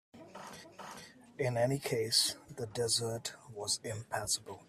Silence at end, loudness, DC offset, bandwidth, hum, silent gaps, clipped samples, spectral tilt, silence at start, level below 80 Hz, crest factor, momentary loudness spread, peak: 0.05 s; -34 LUFS; under 0.1%; 15.5 kHz; none; none; under 0.1%; -3 dB/octave; 0.15 s; -70 dBFS; 22 dB; 20 LU; -14 dBFS